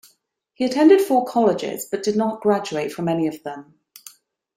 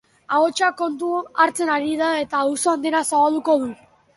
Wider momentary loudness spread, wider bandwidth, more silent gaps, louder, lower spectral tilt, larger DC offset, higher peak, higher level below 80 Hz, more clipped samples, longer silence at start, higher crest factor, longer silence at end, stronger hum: first, 12 LU vs 6 LU; first, 16 kHz vs 12 kHz; neither; about the same, -20 LUFS vs -20 LUFS; first, -5.5 dB/octave vs -2.5 dB/octave; neither; about the same, -2 dBFS vs -4 dBFS; about the same, -66 dBFS vs -66 dBFS; neither; first, 0.6 s vs 0.3 s; about the same, 18 dB vs 18 dB; first, 0.95 s vs 0.4 s; neither